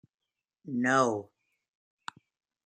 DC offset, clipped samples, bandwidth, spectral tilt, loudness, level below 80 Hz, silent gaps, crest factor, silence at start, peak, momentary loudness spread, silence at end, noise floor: under 0.1%; under 0.1%; 10 kHz; -5 dB/octave; -29 LUFS; -80 dBFS; none; 22 dB; 0.65 s; -12 dBFS; 21 LU; 1.4 s; -67 dBFS